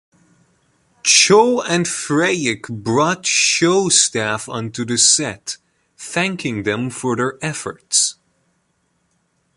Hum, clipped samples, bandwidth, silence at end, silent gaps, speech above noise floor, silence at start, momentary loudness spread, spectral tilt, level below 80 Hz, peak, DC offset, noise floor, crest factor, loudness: none; under 0.1%; 11.5 kHz; 1.45 s; none; 48 dB; 1.05 s; 13 LU; -2.5 dB/octave; -58 dBFS; 0 dBFS; under 0.1%; -66 dBFS; 18 dB; -16 LUFS